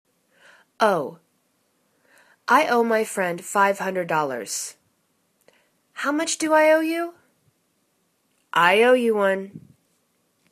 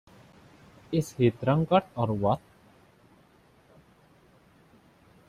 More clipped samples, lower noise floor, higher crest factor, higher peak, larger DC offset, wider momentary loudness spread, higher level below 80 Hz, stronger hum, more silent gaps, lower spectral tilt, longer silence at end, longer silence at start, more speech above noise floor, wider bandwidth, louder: neither; first, -69 dBFS vs -60 dBFS; about the same, 22 dB vs 22 dB; first, -2 dBFS vs -8 dBFS; neither; first, 13 LU vs 7 LU; second, -74 dBFS vs -60 dBFS; neither; neither; second, -3.5 dB/octave vs -7.5 dB/octave; second, 0.95 s vs 2.9 s; about the same, 0.8 s vs 0.9 s; first, 48 dB vs 35 dB; about the same, 14 kHz vs 15 kHz; first, -21 LUFS vs -27 LUFS